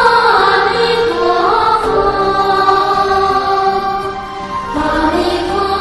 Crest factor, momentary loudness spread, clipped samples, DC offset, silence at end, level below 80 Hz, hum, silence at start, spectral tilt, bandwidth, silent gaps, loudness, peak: 12 dB; 9 LU; under 0.1%; under 0.1%; 0 s; -34 dBFS; none; 0 s; -4.5 dB/octave; 12 kHz; none; -13 LUFS; 0 dBFS